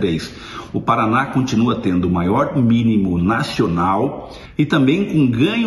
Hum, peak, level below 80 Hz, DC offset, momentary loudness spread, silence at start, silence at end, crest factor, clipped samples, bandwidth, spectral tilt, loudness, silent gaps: none; -4 dBFS; -42 dBFS; under 0.1%; 9 LU; 0 s; 0 s; 14 dB; under 0.1%; 12 kHz; -7 dB/octave; -17 LUFS; none